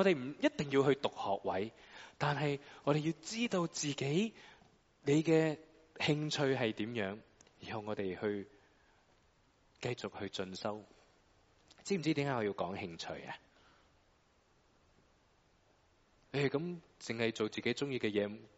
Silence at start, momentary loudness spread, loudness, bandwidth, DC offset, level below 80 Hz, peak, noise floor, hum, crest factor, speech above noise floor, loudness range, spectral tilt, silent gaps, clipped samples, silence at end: 0 s; 13 LU; -37 LUFS; 8 kHz; under 0.1%; -72 dBFS; -16 dBFS; -71 dBFS; none; 20 dB; 35 dB; 10 LU; -4.5 dB/octave; none; under 0.1%; 0.1 s